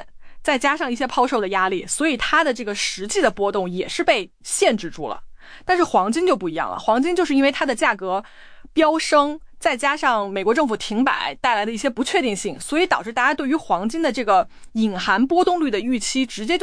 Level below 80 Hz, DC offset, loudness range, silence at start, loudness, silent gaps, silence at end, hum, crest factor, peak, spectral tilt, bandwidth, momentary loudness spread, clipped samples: -48 dBFS; under 0.1%; 1 LU; 0 s; -20 LUFS; none; 0 s; none; 16 dB; -4 dBFS; -3 dB/octave; 10.5 kHz; 7 LU; under 0.1%